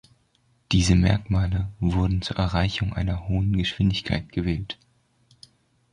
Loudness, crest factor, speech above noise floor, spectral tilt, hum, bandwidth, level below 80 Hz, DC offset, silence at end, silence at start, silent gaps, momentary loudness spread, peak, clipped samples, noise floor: -24 LUFS; 18 dB; 42 dB; -6 dB/octave; none; 10.5 kHz; -34 dBFS; under 0.1%; 1.2 s; 0.7 s; none; 8 LU; -6 dBFS; under 0.1%; -65 dBFS